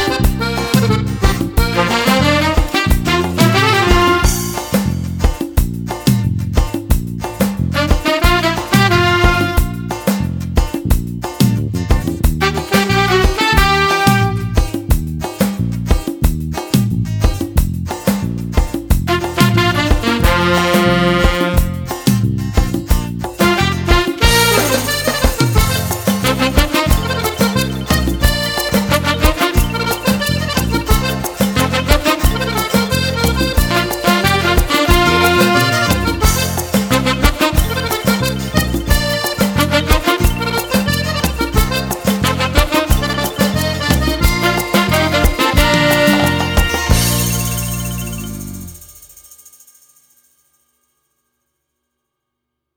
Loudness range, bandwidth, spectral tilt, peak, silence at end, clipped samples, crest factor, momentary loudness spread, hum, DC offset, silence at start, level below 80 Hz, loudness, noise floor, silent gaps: 5 LU; over 20 kHz; -4.5 dB/octave; 0 dBFS; 3.7 s; under 0.1%; 14 dB; 7 LU; none; under 0.1%; 0 s; -20 dBFS; -15 LUFS; -76 dBFS; none